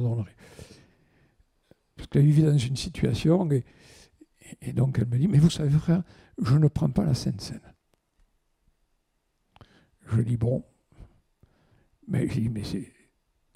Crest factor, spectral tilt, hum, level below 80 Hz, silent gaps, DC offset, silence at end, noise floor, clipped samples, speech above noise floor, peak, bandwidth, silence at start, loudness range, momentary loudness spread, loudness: 18 dB; -7.5 dB/octave; none; -50 dBFS; none; under 0.1%; 0.7 s; -74 dBFS; under 0.1%; 50 dB; -8 dBFS; 12 kHz; 0 s; 9 LU; 17 LU; -25 LUFS